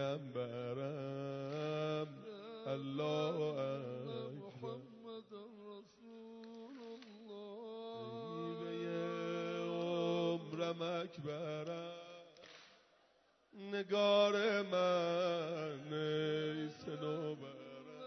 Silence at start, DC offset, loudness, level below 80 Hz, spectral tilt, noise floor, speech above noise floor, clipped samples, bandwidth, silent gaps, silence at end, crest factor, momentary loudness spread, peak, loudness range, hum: 0 s; under 0.1%; -40 LUFS; -88 dBFS; -4.5 dB/octave; -73 dBFS; 37 dB; under 0.1%; 6.2 kHz; none; 0 s; 20 dB; 19 LU; -22 dBFS; 14 LU; none